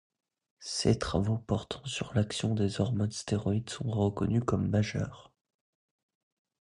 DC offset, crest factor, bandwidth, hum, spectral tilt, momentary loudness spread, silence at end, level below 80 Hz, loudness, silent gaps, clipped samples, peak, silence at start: under 0.1%; 20 dB; 11 kHz; none; -6 dB/octave; 7 LU; 1.45 s; -50 dBFS; -31 LUFS; none; under 0.1%; -12 dBFS; 0.6 s